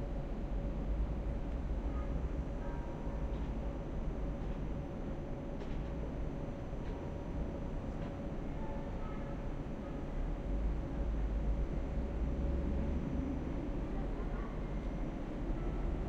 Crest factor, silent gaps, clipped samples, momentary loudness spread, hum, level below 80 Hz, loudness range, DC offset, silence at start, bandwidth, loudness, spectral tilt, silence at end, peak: 14 dB; none; under 0.1%; 5 LU; none; -40 dBFS; 4 LU; under 0.1%; 0 s; 7.2 kHz; -41 LUFS; -8.5 dB/octave; 0 s; -24 dBFS